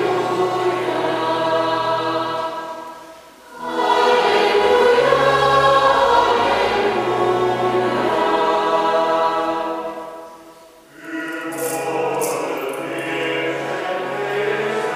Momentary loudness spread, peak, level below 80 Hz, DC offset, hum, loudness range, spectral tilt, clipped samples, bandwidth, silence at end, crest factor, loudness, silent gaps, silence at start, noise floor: 13 LU; -2 dBFS; -52 dBFS; under 0.1%; none; 9 LU; -4 dB/octave; under 0.1%; 15.5 kHz; 0 s; 16 dB; -18 LUFS; none; 0 s; -44 dBFS